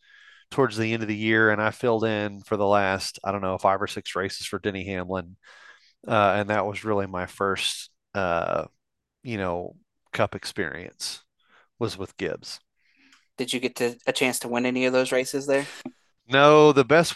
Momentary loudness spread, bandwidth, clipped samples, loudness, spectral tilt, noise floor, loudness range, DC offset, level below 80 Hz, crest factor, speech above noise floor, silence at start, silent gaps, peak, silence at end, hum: 14 LU; 12.5 kHz; under 0.1%; -24 LUFS; -4.5 dB/octave; -79 dBFS; 8 LU; under 0.1%; -56 dBFS; 22 dB; 55 dB; 0.5 s; none; -2 dBFS; 0 s; none